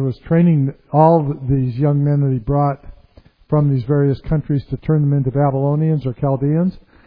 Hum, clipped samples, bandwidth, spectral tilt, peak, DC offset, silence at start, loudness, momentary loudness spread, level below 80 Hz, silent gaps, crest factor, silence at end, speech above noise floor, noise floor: none; under 0.1%; 4.8 kHz; -13 dB/octave; 0 dBFS; under 0.1%; 0 s; -17 LUFS; 7 LU; -40 dBFS; none; 16 dB; 0.3 s; 32 dB; -48 dBFS